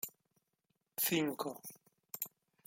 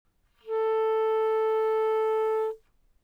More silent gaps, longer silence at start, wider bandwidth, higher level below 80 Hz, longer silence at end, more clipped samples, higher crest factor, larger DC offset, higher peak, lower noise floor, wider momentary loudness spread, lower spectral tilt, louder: neither; second, 0.05 s vs 0.45 s; first, 17 kHz vs 5.2 kHz; second, -84 dBFS vs -68 dBFS; about the same, 0.4 s vs 0.5 s; neither; first, 20 dB vs 8 dB; neither; second, -22 dBFS vs -18 dBFS; first, -84 dBFS vs -55 dBFS; first, 17 LU vs 7 LU; about the same, -3.5 dB/octave vs -3 dB/octave; second, -38 LUFS vs -27 LUFS